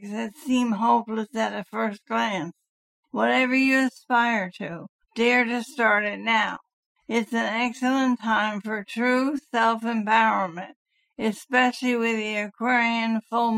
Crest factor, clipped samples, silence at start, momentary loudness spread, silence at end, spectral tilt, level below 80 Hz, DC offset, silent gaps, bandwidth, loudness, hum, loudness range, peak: 18 dB; under 0.1%; 0 s; 11 LU; 0 s; -4.5 dB/octave; -70 dBFS; under 0.1%; 2.69-3.03 s, 4.89-4.99 s, 6.73-6.95 s, 10.76-10.85 s; 14 kHz; -24 LUFS; none; 2 LU; -6 dBFS